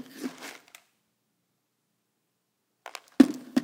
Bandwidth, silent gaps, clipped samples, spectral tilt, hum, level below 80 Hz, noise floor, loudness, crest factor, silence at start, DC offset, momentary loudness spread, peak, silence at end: 16.5 kHz; none; under 0.1%; -5 dB/octave; none; -74 dBFS; -78 dBFS; -23 LUFS; 28 dB; 0.2 s; under 0.1%; 22 LU; -2 dBFS; 0 s